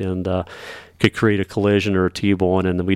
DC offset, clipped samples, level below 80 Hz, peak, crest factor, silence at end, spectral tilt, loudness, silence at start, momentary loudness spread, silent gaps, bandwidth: under 0.1%; under 0.1%; -46 dBFS; -2 dBFS; 16 dB; 0 s; -6.5 dB/octave; -19 LUFS; 0 s; 11 LU; none; 13.5 kHz